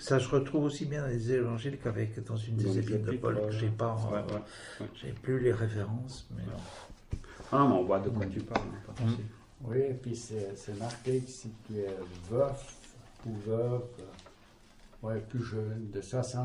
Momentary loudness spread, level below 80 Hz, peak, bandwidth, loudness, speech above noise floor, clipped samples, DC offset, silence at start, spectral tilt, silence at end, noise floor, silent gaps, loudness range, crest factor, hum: 15 LU; -54 dBFS; -14 dBFS; 11.5 kHz; -34 LUFS; 25 dB; under 0.1%; under 0.1%; 0 s; -7 dB/octave; 0 s; -58 dBFS; none; 5 LU; 20 dB; none